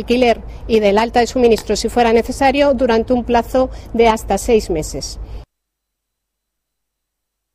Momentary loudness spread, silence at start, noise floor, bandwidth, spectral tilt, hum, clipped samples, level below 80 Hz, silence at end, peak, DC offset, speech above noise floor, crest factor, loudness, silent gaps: 8 LU; 0 s; -77 dBFS; 15.5 kHz; -4.5 dB/octave; none; under 0.1%; -32 dBFS; 2.1 s; -2 dBFS; under 0.1%; 62 dB; 16 dB; -15 LUFS; none